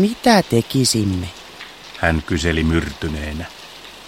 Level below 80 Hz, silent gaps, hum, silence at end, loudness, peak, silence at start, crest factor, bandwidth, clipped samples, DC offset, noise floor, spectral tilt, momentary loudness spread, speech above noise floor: -34 dBFS; none; none; 0 s; -18 LUFS; 0 dBFS; 0 s; 20 dB; 16.5 kHz; under 0.1%; 0.1%; -38 dBFS; -4.5 dB/octave; 20 LU; 20 dB